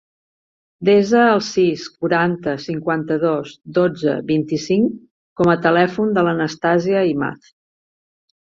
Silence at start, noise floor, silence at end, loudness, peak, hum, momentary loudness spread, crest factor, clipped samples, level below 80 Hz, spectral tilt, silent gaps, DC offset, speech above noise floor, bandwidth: 0.8 s; under -90 dBFS; 1.15 s; -18 LUFS; -2 dBFS; none; 9 LU; 16 dB; under 0.1%; -58 dBFS; -6.5 dB/octave; 5.11-5.36 s; under 0.1%; over 73 dB; 7.6 kHz